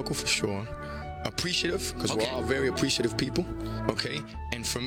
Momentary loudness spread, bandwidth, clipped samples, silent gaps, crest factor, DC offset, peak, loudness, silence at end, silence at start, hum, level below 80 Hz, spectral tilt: 9 LU; 18.5 kHz; under 0.1%; none; 22 dB; under 0.1%; -8 dBFS; -29 LUFS; 0 s; 0 s; none; -46 dBFS; -3.5 dB/octave